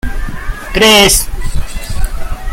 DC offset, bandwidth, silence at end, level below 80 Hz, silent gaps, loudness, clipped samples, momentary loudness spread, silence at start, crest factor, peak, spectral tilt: under 0.1%; 17 kHz; 0 s; -18 dBFS; none; -8 LUFS; 0.2%; 19 LU; 0.05 s; 12 dB; 0 dBFS; -2.5 dB/octave